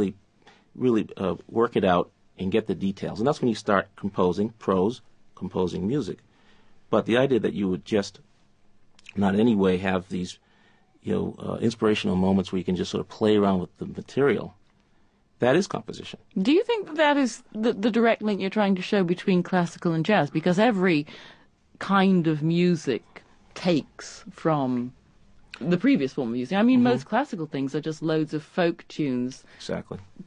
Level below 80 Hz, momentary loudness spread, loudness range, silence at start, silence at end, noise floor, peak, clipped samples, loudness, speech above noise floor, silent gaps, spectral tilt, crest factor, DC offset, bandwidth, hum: -54 dBFS; 13 LU; 4 LU; 0 s; 0 s; -61 dBFS; -4 dBFS; under 0.1%; -25 LUFS; 37 dB; none; -6.5 dB/octave; 20 dB; under 0.1%; 10 kHz; none